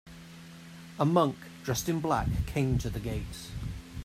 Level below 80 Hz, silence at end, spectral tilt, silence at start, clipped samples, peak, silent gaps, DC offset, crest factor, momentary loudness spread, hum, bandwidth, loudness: -44 dBFS; 0 s; -6 dB/octave; 0.05 s; under 0.1%; -10 dBFS; none; under 0.1%; 20 dB; 21 LU; none; 16 kHz; -31 LUFS